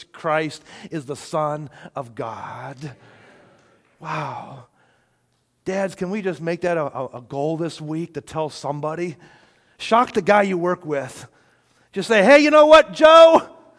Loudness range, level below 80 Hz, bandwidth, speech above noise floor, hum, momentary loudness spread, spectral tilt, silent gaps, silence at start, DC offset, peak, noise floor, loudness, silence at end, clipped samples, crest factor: 18 LU; -58 dBFS; 11 kHz; 48 dB; none; 23 LU; -5 dB/octave; none; 0 s; under 0.1%; -2 dBFS; -67 dBFS; -17 LUFS; 0.3 s; under 0.1%; 18 dB